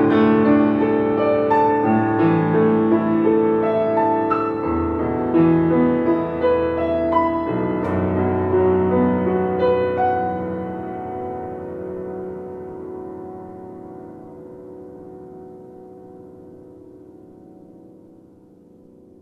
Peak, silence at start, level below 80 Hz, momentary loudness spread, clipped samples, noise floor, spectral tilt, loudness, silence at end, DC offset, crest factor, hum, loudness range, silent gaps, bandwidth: -4 dBFS; 0 s; -48 dBFS; 22 LU; under 0.1%; -48 dBFS; -10 dB/octave; -19 LUFS; 1.35 s; under 0.1%; 16 dB; none; 21 LU; none; 5.2 kHz